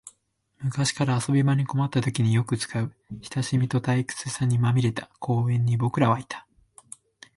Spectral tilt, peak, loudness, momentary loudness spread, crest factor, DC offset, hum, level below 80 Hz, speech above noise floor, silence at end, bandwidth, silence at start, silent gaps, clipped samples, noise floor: -6 dB/octave; -8 dBFS; -25 LUFS; 14 LU; 16 dB; under 0.1%; none; -58 dBFS; 45 dB; 0.95 s; 11.5 kHz; 0.05 s; none; under 0.1%; -69 dBFS